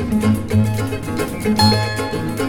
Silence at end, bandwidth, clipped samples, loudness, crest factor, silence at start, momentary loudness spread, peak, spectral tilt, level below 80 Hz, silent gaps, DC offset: 0 s; 18 kHz; under 0.1%; -18 LUFS; 18 dB; 0 s; 8 LU; 0 dBFS; -5.5 dB/octave; -36 dBFS; none; under 0.1%